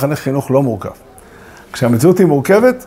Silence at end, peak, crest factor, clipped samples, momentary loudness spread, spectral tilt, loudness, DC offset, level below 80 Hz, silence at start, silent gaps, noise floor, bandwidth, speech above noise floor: 0 s; 0 dBFS; 14 dB; under 0.1%; 15 LU; -7 dB/octave; -13 LUFS; under 0.1%; -48 dBFS; 0 s; none; -38 dBFS; 16 kHz; 26 dB